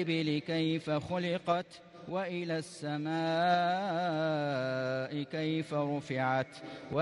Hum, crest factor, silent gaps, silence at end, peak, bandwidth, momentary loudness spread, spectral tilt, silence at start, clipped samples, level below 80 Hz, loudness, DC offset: none; 16 dB; none; 0 s; -16 dBFS; 11.5 kHz; 8 LU; -6.5 dB/octave; 0 s; under 0.1%; -72 dBFS; -33 LUFS; under 0.1%